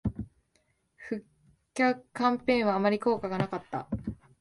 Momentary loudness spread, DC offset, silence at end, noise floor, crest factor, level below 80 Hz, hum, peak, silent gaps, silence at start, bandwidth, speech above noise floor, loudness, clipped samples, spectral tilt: 15 LU; under 0.1%; 0.25 s; -72 dBFS; 18 dB; -52 dBFS; none; -12 dBFS; none; 0.05 s; 11.5 kHz; 44 dB; -30 LUFS; under 0.1%; -6.5 dB/octave